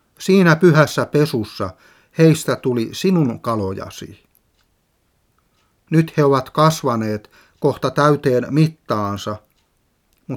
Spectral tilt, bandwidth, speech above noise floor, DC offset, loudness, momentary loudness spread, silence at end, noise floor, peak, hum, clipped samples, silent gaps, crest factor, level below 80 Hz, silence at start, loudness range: -6.5 dB/octave; 16 kHz; 47 dB; under 0.1%; -17 LUFS; 16 LU; 0 s; -64 dBFS; 0 dBFS; none; under 0.1%; none; 18 dB; -58 dBFS; 0.2 s; 7 LU